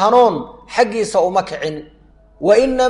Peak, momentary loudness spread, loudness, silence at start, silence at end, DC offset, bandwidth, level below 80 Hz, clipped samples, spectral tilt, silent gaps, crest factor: -2 dBFS; 12 LU; -16 LUFS; 0 s; 0 s; under 0.1%; 11.5 kHz; -44 dBFS; under 0.1%; -4.5 dB/octave; none; 14 dB